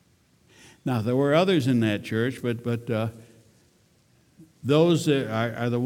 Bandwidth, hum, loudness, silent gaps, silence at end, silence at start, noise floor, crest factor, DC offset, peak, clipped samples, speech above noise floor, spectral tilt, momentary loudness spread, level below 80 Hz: 16.5 kHz; none; -24 LUFS; none; 0 s; 0.85 s; -62 dBFS; 18 dB; under 0.1%; -6 dBFS; under 0.1%; 38 dB; -6.5 dB/octave; 9 LU; -66 dBFS